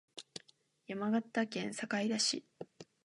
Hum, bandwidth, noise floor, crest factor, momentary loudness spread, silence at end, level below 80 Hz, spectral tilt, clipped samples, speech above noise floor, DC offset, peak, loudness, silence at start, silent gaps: none; 11 kHz; -69 dBFS; 18 dB; 19 LU; 0.2 s; -86 dBFS; -3 dB/octave; under 0.1%; 33 dB; under 0.1%; -20 dBFS; -36 LUFS; 0.15 s; none